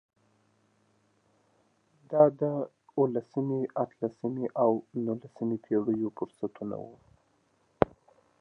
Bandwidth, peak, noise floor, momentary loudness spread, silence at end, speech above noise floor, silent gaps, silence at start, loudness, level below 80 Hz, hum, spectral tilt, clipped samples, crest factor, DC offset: 5.8 kHz; -4 dBFS; -70 dBFS; 13 LU; 0.55 s; 41 dB; none; 2.1 s; -30 LUFS; -64 dBFS; none; -10.5 dB/octave; under 0.1%; 28 dB; under 0.1%